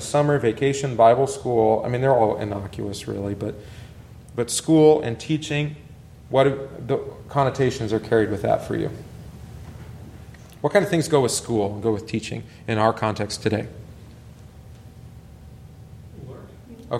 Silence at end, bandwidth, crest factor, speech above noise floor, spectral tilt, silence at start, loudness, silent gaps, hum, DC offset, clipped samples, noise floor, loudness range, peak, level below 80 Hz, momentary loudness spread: 0 s; 14.5 kHz; 20 dB; 22 dB; -5.5 dB/octave; 0 s; -22 LUFS; none; none; under 0.1%; under 0.1%; -43 dBFS; 6 LU; -4 dBFS; -48 dBFS; 23 LU